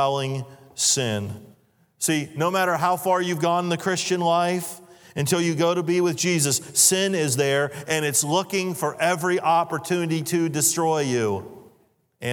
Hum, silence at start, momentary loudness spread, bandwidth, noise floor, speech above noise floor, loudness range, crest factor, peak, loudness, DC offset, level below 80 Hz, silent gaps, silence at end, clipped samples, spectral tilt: none; 0 s; 9 LU; 19.5 kHz; -62 dBFS; 40 dB; 3 LU; 20 dB; -4 dBFS; -22 LUFS; under 0.1%; -72 dBFS; none; 0 s; under 0.1%; -3.5 dB/octave